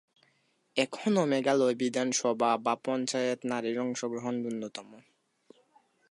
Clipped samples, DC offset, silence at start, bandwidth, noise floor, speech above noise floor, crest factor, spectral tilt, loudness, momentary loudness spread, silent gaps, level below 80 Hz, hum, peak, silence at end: under 0.1%; under 0.1%; 0.75 s; 11.5 kHz; -72 dBFS; 42 dB; 20 dB; -4 dB/octave; -30 LUFS; 8 LU; none; -82 dBFS; none; -12 dBFS; 1.1 s